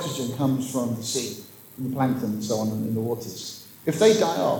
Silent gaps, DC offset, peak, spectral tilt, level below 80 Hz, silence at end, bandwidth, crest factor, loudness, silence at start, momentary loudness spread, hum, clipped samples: none; under 0.1%; -6 dBFS; -5 dB/octave; -68 dBFS; 0 s; over 20 kHz; 18 dB; -25 LUFS; 0 s; 15 LU; none; under 0.1%